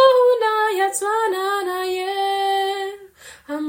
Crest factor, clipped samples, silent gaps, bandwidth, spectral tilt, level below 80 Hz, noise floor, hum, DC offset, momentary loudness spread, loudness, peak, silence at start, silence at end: 18 dB; under 0.1%; none; 16.5 kHz; -0.5 dB/octave; -66 dBFS; -44 dBFS; none; under 0.1%; 12 LU; -20 LUFS; -2 dBFS; 0 s; 0 s